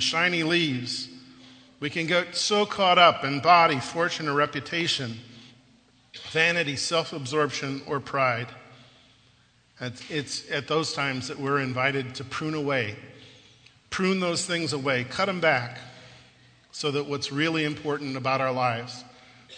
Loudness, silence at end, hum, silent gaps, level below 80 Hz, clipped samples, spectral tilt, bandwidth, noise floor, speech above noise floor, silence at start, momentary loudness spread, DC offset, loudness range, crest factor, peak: -25 LUFS; 0 s; 60 Hz at -60 dBFS; none; -66 dBFS; under 0.1%; -4 dB/octave; 9.4 kHz; -61 dBFS; 35 dB; 0 s; 14 LU; under 0.1%; 8 LU; 22 dB; -4 dBFS